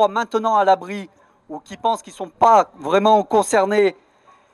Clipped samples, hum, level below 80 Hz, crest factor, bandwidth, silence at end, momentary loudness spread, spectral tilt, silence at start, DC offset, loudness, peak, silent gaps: under 0.1%; none; -64 dBFS; 18 dB; 13 kHz; 0.6 s; 18 LU; -4 dB/octave; 0 s; under 0.1%; -17 LUFS; -2 dBFS; none